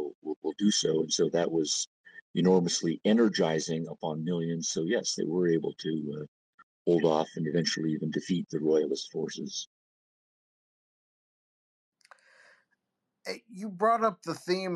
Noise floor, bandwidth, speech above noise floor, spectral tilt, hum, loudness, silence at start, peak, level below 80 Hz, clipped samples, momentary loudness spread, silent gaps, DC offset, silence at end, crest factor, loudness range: -84 dBFS; 12 kHz; 55 dB; -4.5 dB/octave; none; -29 LUFS; 0 s; -12 dBFS; -76 dBFS; under 0.1%; 13 LU; 0.15-0.22 s, 0.36-0.42 s, 1.87-2.04 s, 2.22-2.34 s, 6.28-6.85 s, 9.67-11.92 s; under 0.1%; 0 s; 18 dB; 13 LU